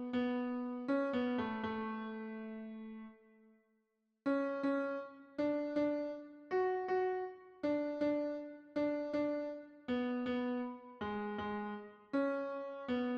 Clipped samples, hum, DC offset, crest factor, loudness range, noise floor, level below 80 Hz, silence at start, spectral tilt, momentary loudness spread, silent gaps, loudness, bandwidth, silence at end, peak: under 0.1%; none; under 0.1%; 14 dB; 4 LU; -81 dBFS; -74 dBFS; 0 s; -7.5 dB/octave; 11 LU; none; -39 LUFS; 6.6 kHz; 0 s; -24 dBFS